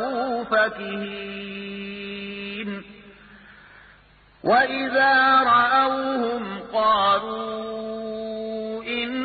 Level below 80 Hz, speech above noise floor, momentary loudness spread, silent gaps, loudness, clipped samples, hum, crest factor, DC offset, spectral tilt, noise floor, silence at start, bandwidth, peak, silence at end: -58 dBFS; 33 dB; 16 LU; none; -22 LUFS; under 0.1%; none; 16 dB; under 0.1%; -8.5 dB/octave; -54 dBFS; 0 s; 4.8 kHz; -8 dBFS; 0 s